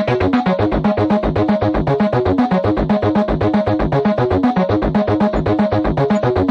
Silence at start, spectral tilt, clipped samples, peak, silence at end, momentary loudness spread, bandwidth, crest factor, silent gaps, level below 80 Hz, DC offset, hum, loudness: 0 s; -9 dB/octave; under 0.1%; -4 dBFS; 0 s; 1 LU; 7.4 kHz; 12 dB; none; -30 dBFS; under 0.1%; none; -16 LUFS